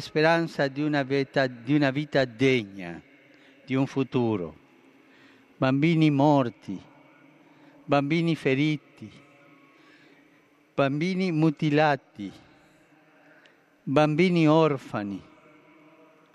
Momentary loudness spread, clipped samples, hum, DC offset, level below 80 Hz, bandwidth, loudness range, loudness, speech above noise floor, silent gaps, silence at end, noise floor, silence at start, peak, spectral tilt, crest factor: 18 LU; under 0.1%; none; under 0.1%; -68 dBFS; 10.5 kHz; 4 LU; -25 LUFS; 36 dB; none; 1.15 s; -60 dBFS; 0 s; -6 dBFS; -7 dB/octave; 20 dB